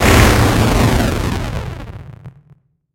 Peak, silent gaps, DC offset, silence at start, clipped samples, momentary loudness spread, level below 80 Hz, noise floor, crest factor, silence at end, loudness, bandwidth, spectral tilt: 0 dBFS; none; under 0.1%; 0 s; under 0.1%; 21 LU; -22 dBFS; -50 dBFS; 14 dB; 0.65 s; -14 LUFS; 17 kHz; -5 dB/octave